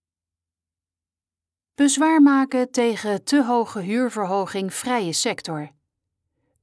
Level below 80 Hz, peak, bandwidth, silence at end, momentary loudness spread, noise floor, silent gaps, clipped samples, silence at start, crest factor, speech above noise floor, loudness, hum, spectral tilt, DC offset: -74 dBFS; -6 dBFS; 11 kHz; 0.95 s; 11 LU; under -90 dBFS; none; under 0.1%; 1.8 s; 16 dB; over 70 dB; -21 LUFS; none; -4 dB/octave; under 0.1%